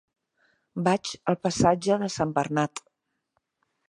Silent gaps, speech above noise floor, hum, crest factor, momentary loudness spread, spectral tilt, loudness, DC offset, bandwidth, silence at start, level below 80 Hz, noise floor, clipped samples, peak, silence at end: none; 52 dB; none; 22 dB; 8 LU; -5.5 dB/octave; -26 LUFS; under 0.1%; 11.5 kHz; 0.75 s; -56 dBFS; -77 dBFS; under 0.1%; -6 dBFS; 1.1 s